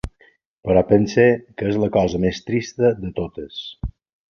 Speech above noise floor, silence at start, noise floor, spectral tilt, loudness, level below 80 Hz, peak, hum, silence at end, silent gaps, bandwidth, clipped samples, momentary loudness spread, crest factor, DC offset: 38 dB; 0.05 s; -57 dBFS; -6.5 dB/octave; -19 LUFS; -40 dBFS; -2 dBFS; none; 0.4 s; 0.47-0.57 s; 7 kHz; under 0.1%; 16 LU; 18 dB; under 0.1%